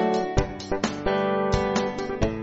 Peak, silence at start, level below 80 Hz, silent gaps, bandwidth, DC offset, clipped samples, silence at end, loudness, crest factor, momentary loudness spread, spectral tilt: -6 dBFS; 0 s; -36 dBFS; none; 8 kHz; under 0.1%; under 0.1%; 0 s; -26 LUFS; 18 dB; 5 LU; -5.5 dB/octave